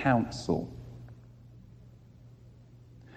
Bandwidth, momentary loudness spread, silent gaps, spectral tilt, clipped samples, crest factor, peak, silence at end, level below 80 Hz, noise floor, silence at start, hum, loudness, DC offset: 9.2 kHz; 25 LU; none; -6.5 dB/octave; under 0.1%; 22 dB; -12 dBFS; 0 s; -56 dBFS; -54 dBFS; 0 s; none; -32 LUFS; under 0.1%